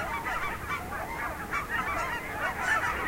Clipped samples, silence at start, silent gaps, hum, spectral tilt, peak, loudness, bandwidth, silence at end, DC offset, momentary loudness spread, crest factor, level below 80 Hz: under 0.1%; 0 s; none; none; -3.5 dB/octave; -14 dBFS; -31 LUFS; 16 kHz; 0 s; under 0.1%; 7 LU; 16 dB; -46 dBFS